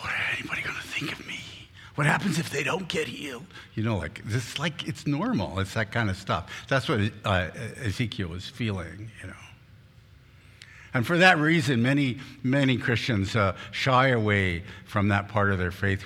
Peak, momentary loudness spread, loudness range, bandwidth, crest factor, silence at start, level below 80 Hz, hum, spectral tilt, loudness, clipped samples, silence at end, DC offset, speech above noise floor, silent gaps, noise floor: -2 dBFS; 14 LU; 7 LU; 15.5 kHz; 24 dB; 0 s; -54 dBFS; none; -5.5 dB/octave; -26 LUFS; under 0.1%; 0 s; under 0.1%; 27 dB; none; -53 dBFS